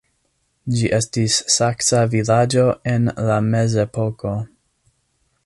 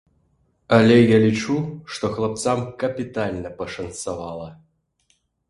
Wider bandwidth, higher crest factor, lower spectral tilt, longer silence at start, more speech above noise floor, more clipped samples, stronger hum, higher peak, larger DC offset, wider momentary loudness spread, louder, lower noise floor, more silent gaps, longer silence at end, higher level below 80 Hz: about the same, 11.5 kHz vs 11.5 kHz; about the same, 16 dB vs 20 dB; second, -4.5 dB/octave vs -6 dB/octave; about the same, 0.65 s vs 0.7 s; about the same, 49 dB vs 46 dB; neither; neither; about the same, -4 dBFS vs -2 dBFS; neither; second, 10 LU vs 17 LU; first, -18 LUFS vs -21 LUFS; about the same, -67 dBFS vs -66 dBFS; neither; about the same, 1 s vs 0.95 s; about the same, -48 dBFS vs -52 dBFS